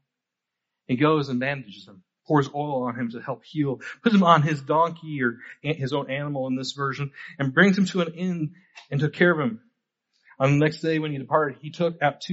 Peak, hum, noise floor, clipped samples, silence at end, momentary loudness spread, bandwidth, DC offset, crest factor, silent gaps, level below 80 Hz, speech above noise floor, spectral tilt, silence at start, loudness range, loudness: -2 dBFS; none; -85 dBFS; under 0.1%; 0 s; 12 LU; 8 kHz; under 0.1%; 22 dB; none; -66 dBFS; 61 dB; -5 dB/octave; 0.9 s; 3 LU; -24 LUFS